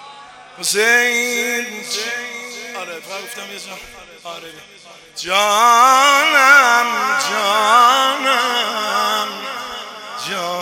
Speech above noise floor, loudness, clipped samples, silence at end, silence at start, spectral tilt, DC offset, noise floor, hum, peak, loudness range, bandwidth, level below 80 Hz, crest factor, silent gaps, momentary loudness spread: 23 dB; -14 LUFS; under 0.1%; 0 s; 0 s; 0 dB/octave; under 0.1%; -39 dBFS; 50 Hz at -65 dBFS; 0 dBFS; 14 LU; 17 kHz; -62 dBFS; 16 dB; none; 20 LU